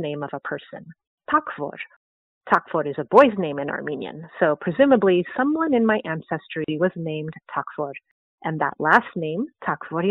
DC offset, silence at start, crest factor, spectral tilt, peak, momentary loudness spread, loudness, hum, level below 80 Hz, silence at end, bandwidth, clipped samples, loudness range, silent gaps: under 0.1%; 0 s; 22 dB; -4.5 dB/octave; -2 dBFS; 15 LU; -22 LUFS; none; -64 dBFS; 0 s; 4 kHz; under 0.1%; 5 LU; 1.07-1.18 s, 1.96-2.41 s, 8.11-8.38 s